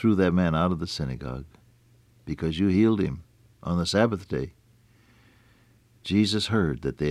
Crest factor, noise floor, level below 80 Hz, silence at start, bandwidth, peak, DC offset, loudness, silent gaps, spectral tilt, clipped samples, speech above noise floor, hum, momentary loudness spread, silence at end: 18 dB; -59 dBFS; -46 dBFS; 0 s; 13 kHz; -8 dBFS; under 0.1%; -25 LUFS; none; -6.5 dB/octave; under 0.1%; 35 dB; none; 17 LU; 0 s